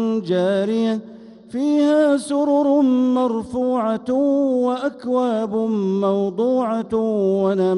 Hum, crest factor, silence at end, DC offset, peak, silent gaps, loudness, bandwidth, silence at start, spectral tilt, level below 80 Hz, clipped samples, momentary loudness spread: none; 12 dB; 0 s; under 0.1%; -6 dBFS; none; -19 LUFS; 11.5 kHz; 0 s; -7 dB/octave; -60 dBFS; under 0.1%; 6 LU